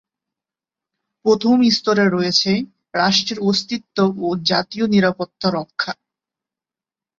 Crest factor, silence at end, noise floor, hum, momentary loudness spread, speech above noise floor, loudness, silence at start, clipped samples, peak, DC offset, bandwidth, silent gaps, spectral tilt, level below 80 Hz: 18 dB; 1.25 s; -90 dBFS; none; 10 LU; 72 dB; -18 LUFS; 1.25 s; under 0.1%; -2 dBFS; under 0.1%; 7.6 kHz; none; -4.5 dB/octave; -60 dBFS